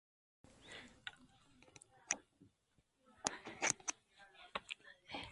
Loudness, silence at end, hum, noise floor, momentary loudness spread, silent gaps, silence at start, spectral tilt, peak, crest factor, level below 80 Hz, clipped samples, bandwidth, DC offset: -44 LUFS; 0 s; none; -79 dBFS; 24 LU; none; 0.45 s; -0.5 dB/octave; -12 dBFS; 38 dB; -76 dBFS; under 0.1%; 11.5 kHz; under 0.1%